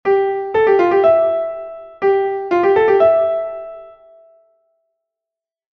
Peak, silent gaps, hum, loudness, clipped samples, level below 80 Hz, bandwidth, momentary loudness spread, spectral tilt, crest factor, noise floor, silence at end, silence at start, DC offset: -2 dBFS; none; none; -15 LUFS; under 0.1%; -56 dBFS; 6 kHz; 16 LU; -7 dB/octave; 14 dB; -86 dBFS; 1.85 s; 0.05 s; under 0.1%